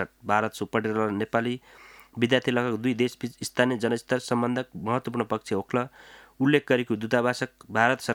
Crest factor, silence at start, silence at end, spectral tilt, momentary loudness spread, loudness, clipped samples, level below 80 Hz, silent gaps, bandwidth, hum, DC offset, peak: 22 dB; 0 s; 0 s; -5.5 dB/octave; 7 LU; -26 LUFS; under 0.1%; -66 dBFS; none; 17.5 kHz; none; under 0.1%; -6 dBFS